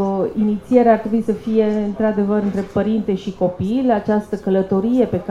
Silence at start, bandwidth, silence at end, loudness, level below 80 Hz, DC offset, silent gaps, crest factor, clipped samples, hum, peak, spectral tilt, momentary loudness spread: 0 s; 7.4 kHz; 0 s; -18 LUFS; -46 dBFS; under 0.1%; none; 18 dB; under 0.1%; none; 0 dBFS; -8.5 dB/octave; 6 LU